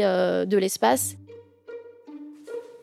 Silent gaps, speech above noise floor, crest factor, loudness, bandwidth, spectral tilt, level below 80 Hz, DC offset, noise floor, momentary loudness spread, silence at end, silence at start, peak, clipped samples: none; 23 dB; 20 dB; -23 LUFS; 16 kHz; -4 dB/octave; -80 dBFS; under 0.1%; -46 dBFS; 21 LU; 0.05 s; 0 s; -6 dBFS; under 0.1%